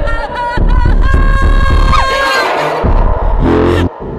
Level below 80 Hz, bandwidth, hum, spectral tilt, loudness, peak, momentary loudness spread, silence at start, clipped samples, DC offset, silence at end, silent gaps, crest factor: -12 dBFS; 10.5 kHz; none; -6 dB/octave; -12 LUFS; -2 dBFS; 4 LU; 0 s; under 0.1%; under 0.1%; 0 s; none; 8 dB